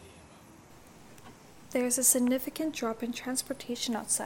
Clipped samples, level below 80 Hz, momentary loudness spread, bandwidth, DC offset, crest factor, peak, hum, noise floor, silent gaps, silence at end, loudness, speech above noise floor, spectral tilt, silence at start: under 0.1%; -66 dBFS; 11 LU; 17 kHz; 0.1%; 24 dB; -8 dBFS; none; -54 dBFS; none; 0 s; -29 LUFS; 23 dB; -2 dB/octave; 0 s